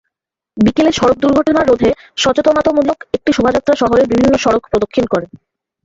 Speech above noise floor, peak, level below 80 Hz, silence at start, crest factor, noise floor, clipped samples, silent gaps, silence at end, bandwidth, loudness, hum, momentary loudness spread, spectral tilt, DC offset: 67 dB; 0 dBFS; -40 dBFS; 0.55 s; 12 dB; -80 dBFS; under 0.1%; none; 0.5 s; 8 kHz; -13 LUFS; none; 5 LU; -5 dB/octave; under 0.1%